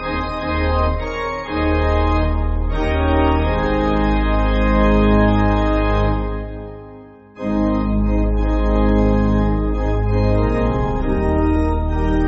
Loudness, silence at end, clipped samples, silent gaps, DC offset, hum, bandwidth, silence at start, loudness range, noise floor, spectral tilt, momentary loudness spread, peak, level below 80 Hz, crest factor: -18 LUFS; 0 s; under 0.1%; none; under 0.1%; none; 7 kHz; 0 s; 3 LU; -40 dBFS; -6.5 dB/octave; 7 LU; -2 dBFS; -20 dBFS; 14 dB